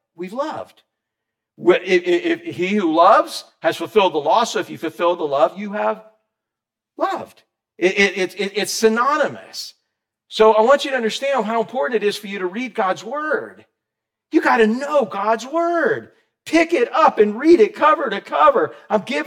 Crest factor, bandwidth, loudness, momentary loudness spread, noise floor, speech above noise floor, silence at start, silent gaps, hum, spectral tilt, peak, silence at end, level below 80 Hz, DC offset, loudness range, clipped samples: 16 dB; 16 kHz; -18 LUFS; 12 LU; -85 dBFS; 67 dB; 0.2 s; none; none; -4 dB/octave; -2 dBFS; 0 s; -64 dBFS; under 0.1%; 5 LU; under 0.1%